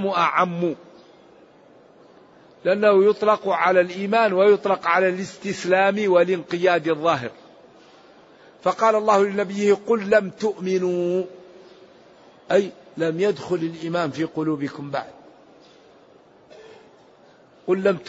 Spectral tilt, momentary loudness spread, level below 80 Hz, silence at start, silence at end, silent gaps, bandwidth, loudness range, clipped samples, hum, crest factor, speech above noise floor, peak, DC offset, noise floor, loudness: -6 dB/octave; 11 LU; -70 dBFS; 0 s; 0 s; none; 8 kHz; 10 LU; under 0.1%; none; 18 dB; 32 dB; -4 dBFS; under 0.1%; -52 dBFS; -21 LUFS